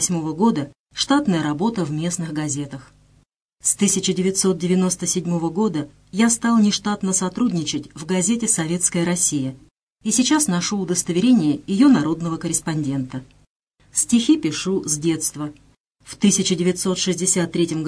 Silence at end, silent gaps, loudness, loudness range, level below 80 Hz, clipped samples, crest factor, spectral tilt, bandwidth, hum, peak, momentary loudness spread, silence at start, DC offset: 0 s; 0.80-0.86 s, 3.36-3.49 s, 9.71-9.75 s, 9.83-9.87 s, 13.50-13.60 s, 15.80-15.84 s; -20 LUFS; 3 LU; -54 dBFS; under 0.1%; 16 dB; -4 dB/octave; 11 kHz; none; -4 dBFS; 9 LU; 0 s; under 0.1%